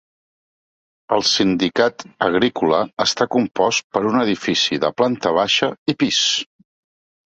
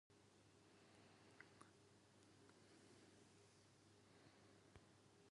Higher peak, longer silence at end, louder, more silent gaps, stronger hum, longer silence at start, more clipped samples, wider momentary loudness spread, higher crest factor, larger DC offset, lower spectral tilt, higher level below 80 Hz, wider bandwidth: first, -2 dBFS vs -46 dBFS; first, 0.95 s vs 0 s; first, -18 LUFS vs -69 LUFS; first, 3.84-3.90 s, 5.78-5.86 s vs none; neither; first, 1.1 s vs 0.1 s; neither; about the same, 4 LU vs 3 LU; second, 18 dB vs 26 dB; neither; about the same, -3.5 dB/octave vs -4 dB/octave; first, -58 dBFS vs -88 dBFS; second, 8.2 kHz vs 11 kHz